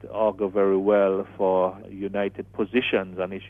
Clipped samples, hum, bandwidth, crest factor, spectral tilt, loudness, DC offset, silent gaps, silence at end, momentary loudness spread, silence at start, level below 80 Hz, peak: under 0.1%; none; 3.9 kHz; 16 dB; -8.5 dB/octave; -24 LUFS; under 0.1%; none; 0 s; 10 LU; 0 s; -58 dBFS; -8 dBFS